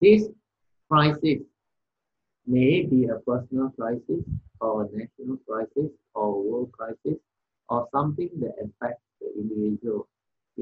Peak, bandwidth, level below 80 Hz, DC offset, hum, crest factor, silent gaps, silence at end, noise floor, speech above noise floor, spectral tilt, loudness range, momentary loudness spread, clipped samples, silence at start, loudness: -6 dBFS; 6.6 kHz; -56 dBFS; under 0.1%; none; 20 dB; none; 0 s; -85 dBFS; 60 dB; -9 dB/octave; 6 LU; 14 LU; under 0.1%; 0 s; -27 LUFS